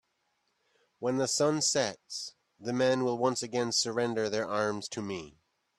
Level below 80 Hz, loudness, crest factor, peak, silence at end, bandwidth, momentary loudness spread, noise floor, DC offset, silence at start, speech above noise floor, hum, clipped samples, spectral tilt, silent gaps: -72 dBFS; -30 LUFS; 18 dB; -14 dBFS; 0.5 s; 13 kHz; 12 LU; -77 dBFS; under 0.1%; 1 s; 47 dB; none; under 0.1%; -3.5 dB/octave; none